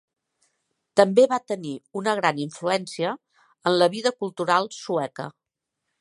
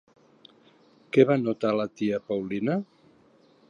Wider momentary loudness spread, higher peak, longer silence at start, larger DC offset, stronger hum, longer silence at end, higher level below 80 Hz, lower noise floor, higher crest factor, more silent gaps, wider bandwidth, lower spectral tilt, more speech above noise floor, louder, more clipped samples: first, 13 LU vs 9 LU; about the same, -2 dBFS vs -4 dBFS; second, 0.95 s vs 1.15 s; neither; neither; second, 0.7 s vs 0.85 s; second, -76 dBFS vs -70 dBFS; first, -82 dBFS vs -59 dBFS; about the same, 24 dB vs 22 dB; neither; first, 11.5 kHz vs 7.2 kHz; second, -4.5 dB/octave vs -8 dB/octave; first, 59 dB vs 35 dB; first, -23 LUFS vs -26 LUFS; neither